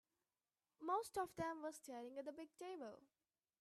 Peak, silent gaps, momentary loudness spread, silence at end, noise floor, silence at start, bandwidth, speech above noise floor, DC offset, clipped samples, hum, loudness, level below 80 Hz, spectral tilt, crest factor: -32 dBFS; none; 11 LU; 0.55 s; under -90 dBFS; 0.8 s; 15 kHz; over 40 dB; under 0.1%; under 0.1%; none; -49 LUFS; -82 dBFS; -4.5 dB/octave; 18 dB